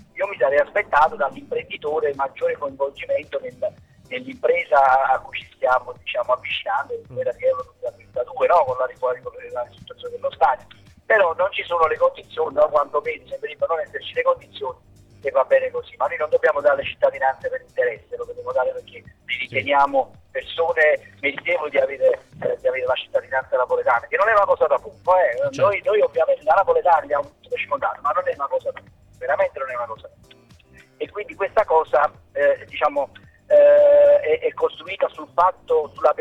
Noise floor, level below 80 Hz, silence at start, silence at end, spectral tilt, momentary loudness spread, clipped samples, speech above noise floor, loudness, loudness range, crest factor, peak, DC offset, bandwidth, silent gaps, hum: -50 dBFS; -58 dBFS; 0.15 s; 0 s; -5 dB/octave; 13 LU; under 0.1%; 30 dB; -21 LUFS; 6 LU; 14 dB; -6 dBFS; under 0.1%; 7.8 kHz; none; none